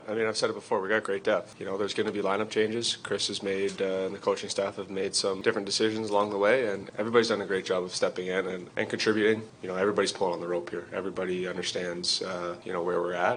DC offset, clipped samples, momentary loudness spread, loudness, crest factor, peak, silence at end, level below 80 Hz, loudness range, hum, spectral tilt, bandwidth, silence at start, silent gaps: under 0.1%; under 0.1%; 8 LU; -29 LUFS; 22 dB; -8 dBFS; 0 s; -72 dBFS; 3 LU; none; -3.5 dB/octave; 10 kHz; 0 s; none